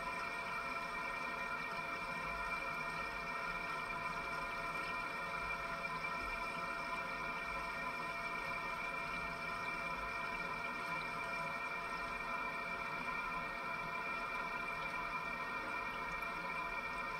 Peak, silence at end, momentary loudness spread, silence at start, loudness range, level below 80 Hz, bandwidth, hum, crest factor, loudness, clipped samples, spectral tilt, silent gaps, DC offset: -28 dBFS; 0 s; 1 LU; 0 s; 0 LU; -62 dBFS; 16 kHz; none; 14 dB; -41 LUFS; under 0.1%; -3.5 dB/octave; none; under 0.1%